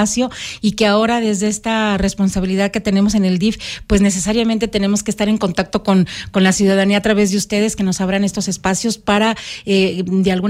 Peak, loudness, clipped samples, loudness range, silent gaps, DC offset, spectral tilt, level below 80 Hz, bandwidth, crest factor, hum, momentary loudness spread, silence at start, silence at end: -2 dBFS; -16 LUFS; under 0.1%; 1 LU; none; under 0.1%; -4.5 dB/octave; -36 dBFS; 14.5 kHz; 14 dB; none; 5 LU; 0 s; 0 s